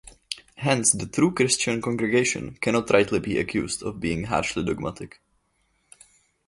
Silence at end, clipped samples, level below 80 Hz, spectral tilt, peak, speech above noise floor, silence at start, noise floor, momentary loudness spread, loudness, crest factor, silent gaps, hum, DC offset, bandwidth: 1.4 s; under 0.1%; -50 dBFS; -4 dB/octave; -4 dBFS; 45 dB; 0.05 s; -69 dBFS; 13 LU; -24 LUFS; 22 dB; none; none; under 0.1%; 11.5 kHz